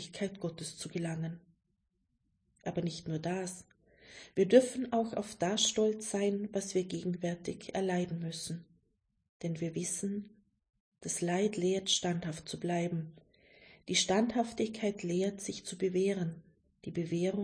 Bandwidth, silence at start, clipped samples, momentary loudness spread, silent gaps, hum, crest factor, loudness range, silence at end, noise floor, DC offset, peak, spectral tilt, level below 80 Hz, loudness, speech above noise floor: 10.5 kHz; 0 s; under 0.1%; 13 LU; 9.29-9.40 s, 10.80-10.92 s; none; 24 dB; 9 LU; 0 s; -80 dBFS; under 0.1%; -10 dBFS; -4.5 dB/octave; -70 dBFS; -34 LUFS; 46 dB